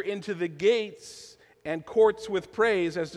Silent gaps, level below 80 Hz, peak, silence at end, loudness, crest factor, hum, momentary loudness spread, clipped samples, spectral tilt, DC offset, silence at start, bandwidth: none; -64 dBFS; -10 dBFS; 0 s; -26 LUFS; 16 dB; none; 19 LU; under 0.1%; -5 dB/octave; under 0.1%; 0 s; 11 kHz